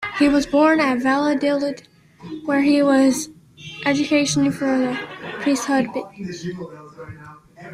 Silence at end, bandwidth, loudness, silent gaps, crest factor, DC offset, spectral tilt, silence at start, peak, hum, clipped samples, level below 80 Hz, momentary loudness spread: 0 s; 14 kHz; -19 LUFS; none; 16 dB; under 0.1%; -4.5 dB/octave; 0 s; -4 dBFS; none; under 0.1%; -54 dBFS; 21 LU